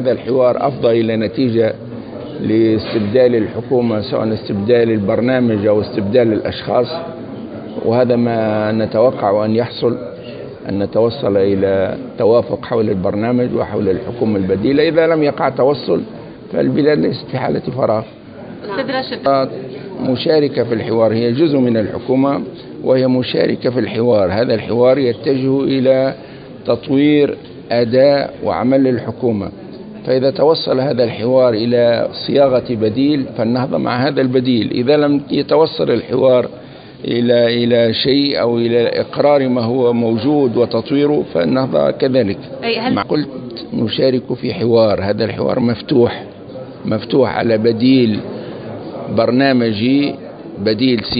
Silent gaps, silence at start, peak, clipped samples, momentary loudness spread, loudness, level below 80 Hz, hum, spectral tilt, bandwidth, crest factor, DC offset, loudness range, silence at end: none; 0 s; 0 dBFS; under 0.1%; 12 LU; -15 LUFS; -46 dBFS; none; -12 dB/octave; 5 kHz; 14 dB; under 0.1%; 2 LU; 0 s